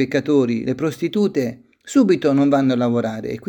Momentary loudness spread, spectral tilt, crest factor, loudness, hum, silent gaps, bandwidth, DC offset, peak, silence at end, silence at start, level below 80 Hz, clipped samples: 7 LU; -6.5 dB/octave; 14 dB; -19 LUFS; none; none; 18.5 kHz; under 0.1%; -4 dBFS; 0.1 s; 0 s; -60 dBFS; under 0.1%